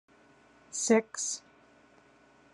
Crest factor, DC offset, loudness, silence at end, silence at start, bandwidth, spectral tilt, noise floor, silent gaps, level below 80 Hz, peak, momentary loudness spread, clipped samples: 24 dB; under 0.1%; -30 LUFS; 1.15 s; 0.75 s; 11.5 kHz; -3 dB/octave; -61 dBFS; none; -80 dBFS; -10 dBFS; 13 LU; under 0.1%